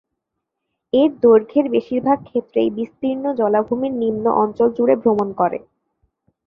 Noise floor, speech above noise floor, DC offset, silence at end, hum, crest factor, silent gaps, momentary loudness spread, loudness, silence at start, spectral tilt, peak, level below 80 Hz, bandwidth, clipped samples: -79 dBFS; 61 dB; under 0.1%; 0.9 s; none; 16 dB; none; 8 LU; -18 LUFS; 0.95 s; -9 dB/octave; -2 dBFS; -58 dBFS; 4.9 kHz; under 0.1%